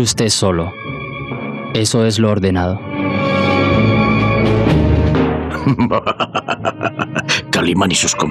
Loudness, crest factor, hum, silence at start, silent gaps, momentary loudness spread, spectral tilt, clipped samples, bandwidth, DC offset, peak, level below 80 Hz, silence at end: -15 LUFS; 12 dB; none; 0 s; none; 8 LU; -4.5 dB/octave; under 0.1%; 13.5 kHz; under 0.1%; -2 dBFS; -32 dBFS; 0 s